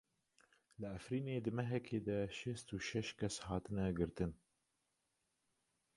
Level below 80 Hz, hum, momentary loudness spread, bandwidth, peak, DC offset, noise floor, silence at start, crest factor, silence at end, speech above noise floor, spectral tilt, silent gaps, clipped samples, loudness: -62 dBFS; none; 5 LU; 11.5 kHz; -24 dBFS; under 0.1%; -85 dBFS; 0.8 s; 20 dB; 1.6 s; 44 dB; -6 dB/octave; none; under 0.1%; -43 LUFS